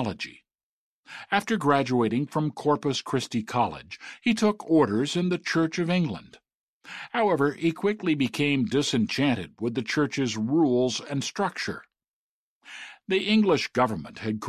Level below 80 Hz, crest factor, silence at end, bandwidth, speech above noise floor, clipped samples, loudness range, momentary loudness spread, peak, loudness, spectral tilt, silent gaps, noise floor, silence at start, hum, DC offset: -62 dBFS; 18 dB; 0 s; 13.5 kHz; 23 dB; under 0.1%; 2 LU; 14 LU; -8 dBFS; -26 LUFS; -5.5 dB/octave; 0.63-1.04 s, 6.55-6.81 s, 12.08-12.61 s; -49 dBFS; 0 s; none; under 0.1%